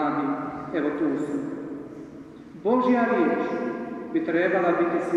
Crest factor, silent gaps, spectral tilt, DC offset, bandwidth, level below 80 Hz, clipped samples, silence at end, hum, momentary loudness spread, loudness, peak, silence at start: 16 dB; none; -7.5 dB/octave; under 0.1%; 9.4 kHz; -64 dBFS; under 0.1%; 0 s; none; 17 LU; -25 LUFS; -10 dBFS; 0 s